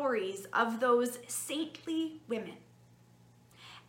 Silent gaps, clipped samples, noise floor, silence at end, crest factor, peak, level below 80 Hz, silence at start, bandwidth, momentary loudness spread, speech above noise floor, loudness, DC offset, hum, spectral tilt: none; under 0.1%; -61 dBFS; 0.1 s; 20 dB; -16 dBFS; -80 dBFS; 0 s; 17 kHz; 14 LU; 28 dB; -33 LUFS; under 0.1%; none; -3 dB/octave